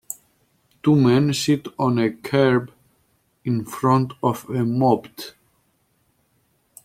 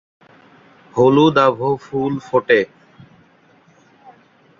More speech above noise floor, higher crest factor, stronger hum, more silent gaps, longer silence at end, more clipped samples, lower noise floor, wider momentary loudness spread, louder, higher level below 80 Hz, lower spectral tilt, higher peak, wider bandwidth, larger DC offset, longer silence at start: first, 46 dB vs 37 dB; about the same, 18 dB vs 18 dB; neither; neither; second, 1.55 s vs 1.95 s; neither; first, -66 dBFS vs -52 dBFS; first, 18 LU vs 10 LU; second, -20 LUFS vs -16 LUFS; about the same, -60 dBFS vs -58 dBFS; about the same, -6.5 dB/octave vs -7 dB/octave; about the same, -4 dBFS vs -2 dBFS; first, 16 kHz vs 7.4 kHz; neither; second, 0.1 s vs 0.95 s